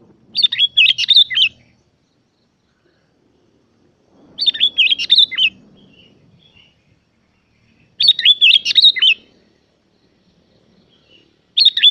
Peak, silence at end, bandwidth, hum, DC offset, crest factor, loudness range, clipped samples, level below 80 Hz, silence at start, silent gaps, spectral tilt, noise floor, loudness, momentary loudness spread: 0 dBFS; 0 s; 12.5 kHz; none; under 0.1%; 18 dB; 6 LU; under 0.1%; -66 dBFS; 0.35 s; none; 1.5 dB/octave; -62 dBFS; -11 LUFS; 9 LU